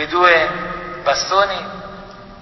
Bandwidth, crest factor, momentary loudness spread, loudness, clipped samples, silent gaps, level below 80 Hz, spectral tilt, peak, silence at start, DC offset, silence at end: 6.2 kHz; 18 dB; 22 LU; -16 LUFS; under 0.1%; none; -46 dBFS; -2.5 dB/octave; 0 dBFS; 0 s; under 0.1%; 0 s